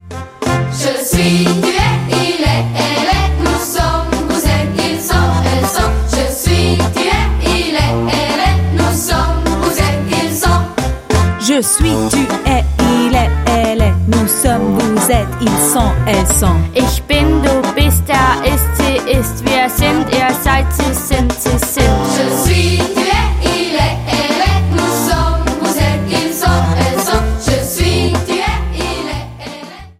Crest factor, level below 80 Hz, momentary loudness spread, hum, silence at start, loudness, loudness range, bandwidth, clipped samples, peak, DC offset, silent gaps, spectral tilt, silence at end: 12 dB; -20 dBFS; 4 LU; none; 0.05 s; -13 LUFS; 2 LU; 16.5 kHz; under 0.1%; 0 dBFS; under 0.1%; none; -4.5 dB/octave; 0.1 s